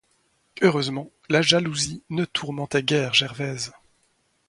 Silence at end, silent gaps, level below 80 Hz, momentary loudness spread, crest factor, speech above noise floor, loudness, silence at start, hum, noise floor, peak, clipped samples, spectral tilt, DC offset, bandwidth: 0.8 s; none; -60 dBFS; 10 LU; 24 dB; 44 dB; -23 LUFS; 0.55 s; none; -67 dBFS; -2 dBFS; under 0.1%; -4 dB/octave; under 0.1%; 11.5 kHz